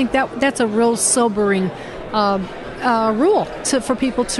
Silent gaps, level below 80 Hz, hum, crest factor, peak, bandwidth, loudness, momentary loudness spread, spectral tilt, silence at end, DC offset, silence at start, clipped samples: none; -44 dBFS; none; 14 dB; -4 dBFS; 12 kHz; -18 LUFS; 9 LU; -3.5 dB/octave; 0 s; under 0.1%; 0 s; under 0.1%